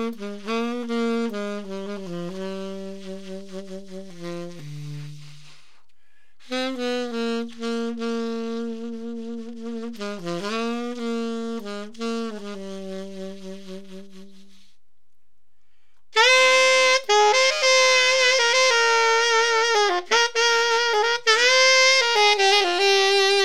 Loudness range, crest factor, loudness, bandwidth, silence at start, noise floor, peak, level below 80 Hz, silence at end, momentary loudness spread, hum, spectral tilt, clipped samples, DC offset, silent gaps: 19 LU; 20 dB; -19 LUFS; 16 kHz; 0 s; -76 dBFS; -2 dBFS; -72 dBFS; 0 s; 21 LU; none; -1.5 dB/octave; under 0.1%; 1%; none